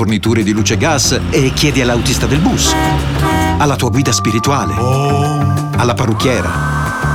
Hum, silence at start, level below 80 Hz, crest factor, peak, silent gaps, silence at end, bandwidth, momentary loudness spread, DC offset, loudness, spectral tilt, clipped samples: none; 0 s; -26 dBFS; 12 dB; 0 dBFS; none; 0 s; 17 kHz; 3 LU; 0.5%; -13 LUFS; -4.5 dB/octave; under 0.1%